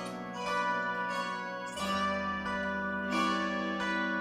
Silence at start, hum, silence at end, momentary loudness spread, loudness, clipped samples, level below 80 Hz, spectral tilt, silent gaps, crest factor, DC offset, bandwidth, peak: 0 s; none; 0 s; 6 LU; -33 LUFS; under 0.1%; -64 dBFS; -4.5 dB/octave; none; 14 dB; under 0.1%; 15.5 kHz; -18 dBFS